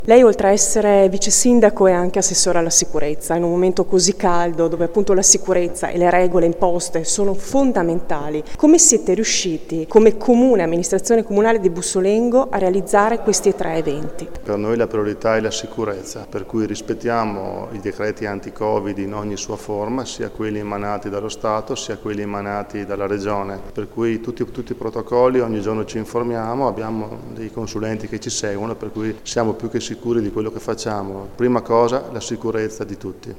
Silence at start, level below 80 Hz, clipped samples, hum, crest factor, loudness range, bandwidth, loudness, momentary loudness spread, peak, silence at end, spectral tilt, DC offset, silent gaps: 0 s; -40 dBFS; under 0.1%; none; 18 dB; 9 LU; 17 kHz; -18 LUFS; 13 LU; 0 dBFS; 0 s; -4 dB/octave; under 0.1%; none